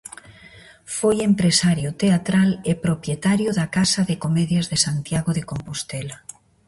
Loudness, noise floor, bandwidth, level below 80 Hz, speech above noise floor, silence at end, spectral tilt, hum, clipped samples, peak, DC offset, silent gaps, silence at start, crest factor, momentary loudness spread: -21 LUFS; -46 dBFS; 11.5 kHz; -50 dBFS; 26 dB; 0.5 s; -5 dB/octave; none; under 0.1%; -4 dBFS; under 0.1%; none; 0.3 s; 18 dB; 13 LU